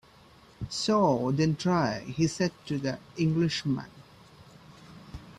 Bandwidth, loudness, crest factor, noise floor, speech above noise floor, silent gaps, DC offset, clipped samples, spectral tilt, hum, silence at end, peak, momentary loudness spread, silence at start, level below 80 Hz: 12 kHz; -28 LUFS; 18 dB; -56 dBFS; 28 dB; none; under 0.1%; under 0.1%; -6 dB/octave; none; 0.05 s; -12 dBFS; 19 LU; 0.6 s; -56 dBFS